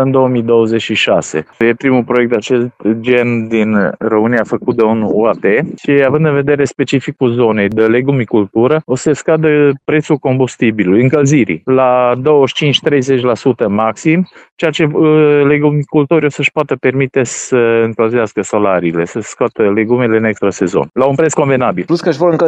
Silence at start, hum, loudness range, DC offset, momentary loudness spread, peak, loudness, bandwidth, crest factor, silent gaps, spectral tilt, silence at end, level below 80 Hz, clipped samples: 0 s; none; 2 LU; under 0.1%; 5 LU; 0 dBFS; -12 LUFS; 9 kHz; 12 dB; 14.52-14.57 s; -6 dB/octave; 0 s; -52 dBFS; under 0.1%